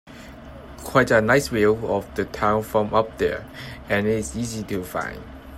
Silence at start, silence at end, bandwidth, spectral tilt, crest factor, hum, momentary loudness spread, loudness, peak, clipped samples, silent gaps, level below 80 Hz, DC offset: 0.05 s; 0 s; 16 kHz; -5.5 dB/octave; 20 dB; none; 21 LU; -22 LUFS; -2 dBFS; under 0.1%; none; -44 dBFS; under 0.1%